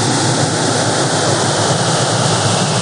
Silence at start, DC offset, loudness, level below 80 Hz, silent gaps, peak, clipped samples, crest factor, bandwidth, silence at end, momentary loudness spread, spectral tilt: 0 s; 0.2%; -14 LUFS; -50 dBFS; none; 0 dBFS; under 0.1%; 14 dB; 10.5 kHz; 0 s; 1 LU; -3.5 dB/octave